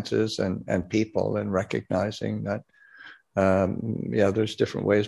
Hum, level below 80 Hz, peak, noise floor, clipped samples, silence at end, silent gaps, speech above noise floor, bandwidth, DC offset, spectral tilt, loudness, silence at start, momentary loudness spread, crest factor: none; -50 dBFS; -8 dBFS; -49 dBFS; under 0.1%; 0 s; none; 24 dB; 12 kHz; under 0.1%; -6.5 dB/octave; -26 LUFS; 0 s; 8 LU; 18 dB